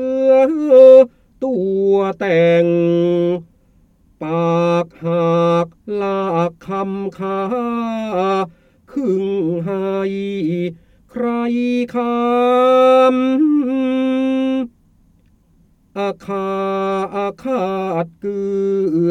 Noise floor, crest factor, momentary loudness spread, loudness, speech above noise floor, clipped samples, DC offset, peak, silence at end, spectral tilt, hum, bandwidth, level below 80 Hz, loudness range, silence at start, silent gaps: -54 dBFS; 16 dB; 12 LU; -16 LUFS; 38 dB; under 0.1%; under 0.1%; 0 dBFS; 0 s; -8 dB/octave; none; 7.4 kHz; -56 dBFS; 8 LU; 0 s; none